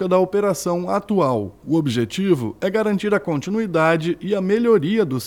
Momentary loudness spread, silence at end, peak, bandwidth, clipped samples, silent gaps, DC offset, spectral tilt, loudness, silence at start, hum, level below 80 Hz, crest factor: 5 LU; 0 s; -4 dBFS; 17.5 kHz; under 0.1%; none; under 0.1%; -6.5 dB/octave; -20 LUFS; 0 s; none; -56 dBFS; 16 dB